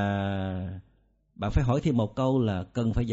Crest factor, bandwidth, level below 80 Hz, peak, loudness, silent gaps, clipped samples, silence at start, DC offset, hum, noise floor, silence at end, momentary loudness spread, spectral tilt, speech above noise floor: 16 dB; 8 kHz; -40 dBFS; -12 dBFS; -28 LUFS; none; under 0.1%; 0 s; under 0.1%; none; -65 dBFS; 0 s; 10 LU; -7.5 dB/octave; 40 dB